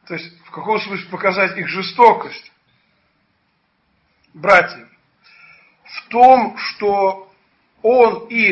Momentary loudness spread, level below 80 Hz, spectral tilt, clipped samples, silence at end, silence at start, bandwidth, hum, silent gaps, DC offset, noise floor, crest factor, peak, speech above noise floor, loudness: 20 LU; -60 dBFS; -5.5 dB/octave; under 0.1%; 0 s; 0.1 s; 8 kHz; none; none; under 0.1%; -64 dBFS; 18 dB; 0 dBFS; 49 dB; -15 LUFS